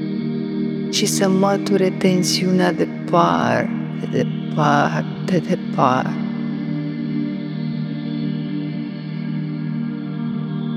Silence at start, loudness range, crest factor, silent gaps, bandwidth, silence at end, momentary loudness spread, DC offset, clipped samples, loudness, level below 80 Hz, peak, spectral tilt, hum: 0 s; 7 LU; 20 dB; none; 15 kHz; 0 s; 9 LU; under 0.1%; under 0.1%; -20 LUFS; -64 dBFS; 0 dBFS; -5.5 dB/octave; none